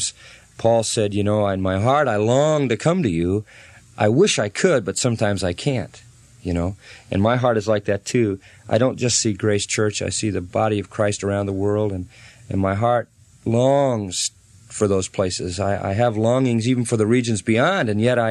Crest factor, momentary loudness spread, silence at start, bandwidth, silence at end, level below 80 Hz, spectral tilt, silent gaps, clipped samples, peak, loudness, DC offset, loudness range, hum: 18 dB; 8 LU; 0 s; 12.5 kHz; 0 s; -50 dBFS; -5 dB/octave; none; under 0.1%; -4 dBFS; -20 LUFS; under 0.1%; 3 LU; none